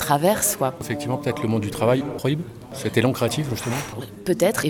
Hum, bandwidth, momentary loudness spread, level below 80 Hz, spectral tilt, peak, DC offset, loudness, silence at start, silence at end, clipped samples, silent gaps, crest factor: none; 19 kHz; 9 LU; -52 dBFS; -5 dB/octave; -4 dBFS; under 0.1%; -23 LUFS; 0 s; 0 s; under 0.1%; none; 18 dB